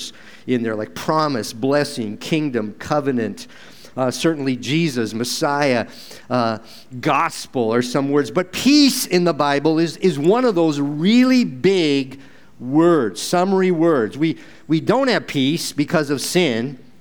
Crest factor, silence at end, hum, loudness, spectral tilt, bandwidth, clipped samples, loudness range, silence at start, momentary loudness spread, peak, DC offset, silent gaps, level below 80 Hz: 16 dB; 0.25 s; none; -19 LUFS; -5 dB/octave; over 20 kHz; under 0.1%; 5 LU; 0 s; 10 LU; -2 dBFS; 0.7%; none; -62 dBFS